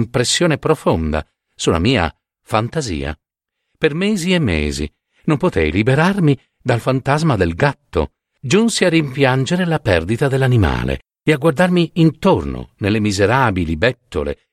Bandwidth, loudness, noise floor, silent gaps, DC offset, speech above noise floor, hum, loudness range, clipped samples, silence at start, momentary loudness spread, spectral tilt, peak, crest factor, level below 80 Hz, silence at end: 14.5 kHz; -17 LUFS; -76 dBFS; none; under 0.1%; 60 dB; none; 4 LU; under 0.1%; 0 s; 9 LU; -5.5 dB/octave; 0 dBFS; 16 dB; -34 dBFS; 0.2 s